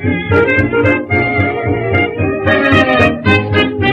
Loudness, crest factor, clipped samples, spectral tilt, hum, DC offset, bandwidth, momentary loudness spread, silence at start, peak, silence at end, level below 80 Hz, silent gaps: -12 LUFS; 12 dB; under 0.1%; -7.5 dB/octave; none; under 0.1%; 8 kHz; 5 LU; 0 s; 0 dBFS; 0 s; -36 dBFS; none